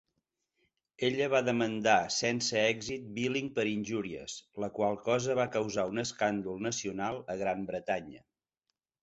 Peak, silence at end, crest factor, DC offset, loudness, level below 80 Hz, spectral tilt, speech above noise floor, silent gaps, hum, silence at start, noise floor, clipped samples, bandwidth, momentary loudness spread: -12 dBFS; 0.85 s; 22 dB; under 0.1%; -32 LUFS; -68 dBFS; -4 dB/octave; 54 dB; none; none; 1 s; -85 dBFS; under 0.1%; 8.4 kHz; 9 LU